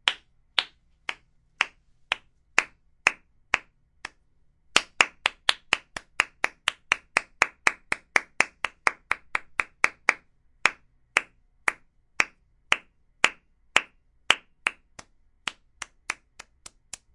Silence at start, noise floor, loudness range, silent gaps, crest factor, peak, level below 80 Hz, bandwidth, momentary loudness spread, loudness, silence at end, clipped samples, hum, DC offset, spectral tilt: 0.05 s; -63 dBFS; 3 LU; none; 28 dB; -2 dBFS; -62 dBFS; 11.5 kHz; 17 LU; -27 LUFS; 1 s; under 0.1%; none; under 0.1%; 0.5 dB/octave